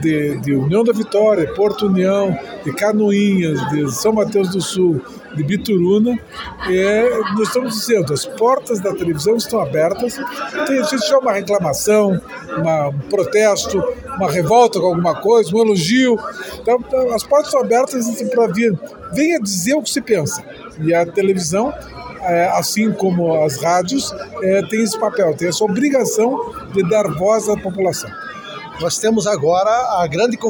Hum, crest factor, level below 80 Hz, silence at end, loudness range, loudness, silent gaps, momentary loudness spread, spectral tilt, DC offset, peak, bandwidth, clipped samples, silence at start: none; 16 dB; -48 dBFS; 0 s; 3 LU; -16 LUFS; none; 9 LU; -5 dB/octave; under 0.1%; 0 dBFS; 17.5 kHz; under 0.1%; 0 s